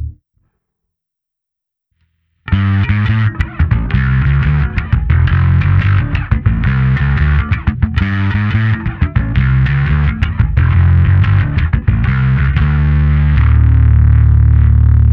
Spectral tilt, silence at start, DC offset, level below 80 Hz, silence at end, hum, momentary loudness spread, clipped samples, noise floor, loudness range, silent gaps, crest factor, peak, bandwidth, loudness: -9.5 dB/octave; 0 s; under 0.1%; -16 dBFS; 0 s; none; 6 LU; under 0.1%; -80 dBFS; 5 LU; none; 10 dB; 0 dBFS; 4.7 kHz; -13 LUFS